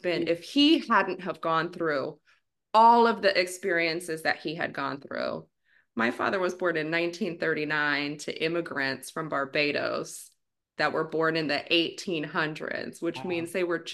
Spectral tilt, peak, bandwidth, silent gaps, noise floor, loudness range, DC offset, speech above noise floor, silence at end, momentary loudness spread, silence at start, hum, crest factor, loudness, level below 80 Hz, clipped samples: -4 dB/octave; -8 dBFS; 12.5 kHz; none; -68 dBFS; 5 LU; under 0.1%; 41 dB; 0 s; 12 LU; 0.05 s; none; 20 dB; -27 LUFS; -76 dBFS; under 0.1%